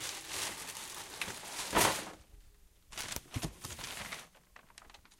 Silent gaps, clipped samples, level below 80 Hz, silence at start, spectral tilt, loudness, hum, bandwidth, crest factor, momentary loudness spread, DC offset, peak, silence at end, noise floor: none; under 0.1%; -58 dBFS; 0 s; -2 dB/octave; -37 LUFS; none; 17 kHz; 28 dB; 26 LU; under 0.1%; -12 dBFS; 0.05 s; -61 dBFS